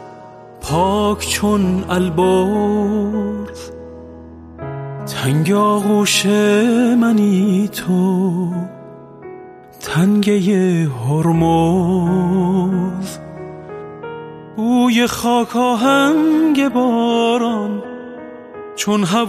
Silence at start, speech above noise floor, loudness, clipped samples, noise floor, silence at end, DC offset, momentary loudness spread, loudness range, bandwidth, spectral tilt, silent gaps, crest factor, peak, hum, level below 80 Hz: 0 s; 23 dB; -16 LUFS; under 0.1%; -37 dBFS; 0 s; under 0.1%; 19 LU; 5 LU; 15.5 kHz; -5.5 dB/octave; none; 14 dB; -2 dBFS; none; -44 dBFS